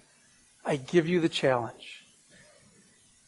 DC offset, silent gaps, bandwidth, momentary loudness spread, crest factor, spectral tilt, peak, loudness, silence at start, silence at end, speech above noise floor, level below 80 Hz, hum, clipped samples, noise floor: under 0.1%; none; 11.5 kHz; 20 LU; 22 dB; -5.5 dB/octave; -10 dBFS; -28 LUFS; 0.65 s; 1.3 s; 34 dB; -68 dBFS; none; under 0.1%; -62 dBFS